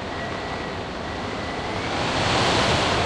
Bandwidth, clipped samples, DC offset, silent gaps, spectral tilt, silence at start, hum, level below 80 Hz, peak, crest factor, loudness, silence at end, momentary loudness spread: 12 kHz; under 0.1%; under 0.1%; none; -4 dB/octave; 0 s; none; -40 dBFS; -8 dBFS; 16 dB; -24 LUFS; 0 s; 10 LU